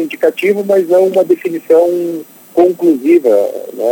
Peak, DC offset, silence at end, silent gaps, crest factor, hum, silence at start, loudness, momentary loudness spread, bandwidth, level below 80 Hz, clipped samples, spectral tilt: 0 dBFS; under 0.1%; 0 s; none; 12 dB; none; 0 s; -12 LUFS; 9 LU; 17 kHz; -66 dBFS; under 0.1%; -6 dB/octave